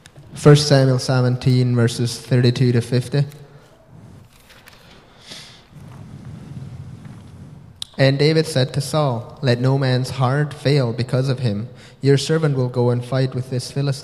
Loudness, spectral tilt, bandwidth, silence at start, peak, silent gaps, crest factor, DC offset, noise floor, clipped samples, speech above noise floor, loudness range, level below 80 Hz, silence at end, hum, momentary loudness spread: -18 LUFS; -6.5 dB/octave; 12.5 kHz; 0.15 s; 0 dBFS; none; 20 dB; under 0.1%; -46 dBFS; under 0.1%; 29 dB; 21 LU; -52 dBFS; 0 s; none; 22 LU